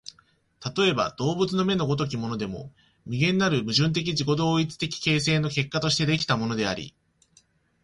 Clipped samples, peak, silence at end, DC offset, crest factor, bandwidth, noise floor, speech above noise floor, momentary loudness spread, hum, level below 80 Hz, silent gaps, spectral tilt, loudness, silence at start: under 0.1%; -8 dBFS; 0.95 s; under 0.1%; 18 dB; 11.5 kHz; -62 dBFS; 38 dB; 11 LU; none; -56 dBFS; none; -5 dB/octave; -25 LUFS; 0.6 s